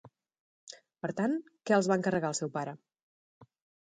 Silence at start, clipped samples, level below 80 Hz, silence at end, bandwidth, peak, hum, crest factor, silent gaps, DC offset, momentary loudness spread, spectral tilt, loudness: 0.7 s; under 0.1%; -74 dBFS; 0.45 s; 9.6 kHz; -14 dBFS; none; 20 dB; 3.02-3.41 s; under 0.1%; 23 LU; -5 dB/octave; -32 LUFS